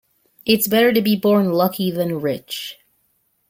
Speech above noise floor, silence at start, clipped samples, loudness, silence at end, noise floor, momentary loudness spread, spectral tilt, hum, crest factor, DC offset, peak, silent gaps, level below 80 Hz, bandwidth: 48 dB; 0.45 s; under 0.1%; -18 LUFS; 0.75 s; -66 dBFS; 13 LU; -5 dB/octave; none; 18 dB; under 0.1%; -2 dBFS; none; -60 dBFS; 17 kHz